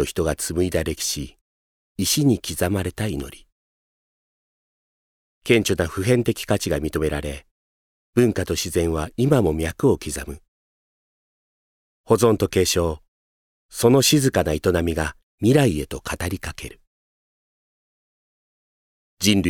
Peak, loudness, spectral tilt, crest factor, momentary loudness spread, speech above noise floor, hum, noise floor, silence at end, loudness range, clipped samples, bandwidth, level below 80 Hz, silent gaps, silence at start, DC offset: -2 dBFS; -21 LUFS; -5 dB/octave; 22 dB; 15 LU; over 69 dB; none; under -90 dBFS; 0 s; 6 LU; under 0.1%; 19.5 kHz; -40 dBFS; 1.41-1.95 s, 3.52-5.42 s, 7.51-8.13 s, 10.48-12.04 s, 13.08-13.69 s, 15.23-15.38 s, 16.87-19.17 s; 0 s; under 0.1%